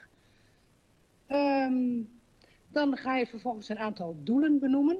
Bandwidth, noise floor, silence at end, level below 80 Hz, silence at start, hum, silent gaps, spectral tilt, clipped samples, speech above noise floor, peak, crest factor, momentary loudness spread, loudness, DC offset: 7 kHz; -66 dBFS; 0 s; -70 dBFS; 1.3 s; none; none; -7 dB/octave; under 0.1%; 37 dB; -16 dBFS; 14 dB; 11 LU; -30 LUFS; under 0.1%